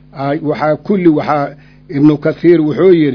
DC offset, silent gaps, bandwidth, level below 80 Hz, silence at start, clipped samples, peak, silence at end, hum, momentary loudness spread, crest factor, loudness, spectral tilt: under 0.1%; none; 5.4 kHz; -48 dBFS; 0.15 s; 0.5%; 0 dBFS; 0 s; none; 9 LU; 12 dB; -12 LUFS; -9.5 dB/octave